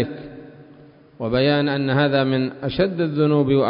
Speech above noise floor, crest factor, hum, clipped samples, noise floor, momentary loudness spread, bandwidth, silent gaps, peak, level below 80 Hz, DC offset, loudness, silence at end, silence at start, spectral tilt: 28 dB; 14 dB; none; under 0.1%; -47 dBFS; 14 LU; 5.4 kHz; none; -6 dBFS; -50 dBFS; under 0.1%; -20 LUFS; 0 s; 0 s; -12 dB/octave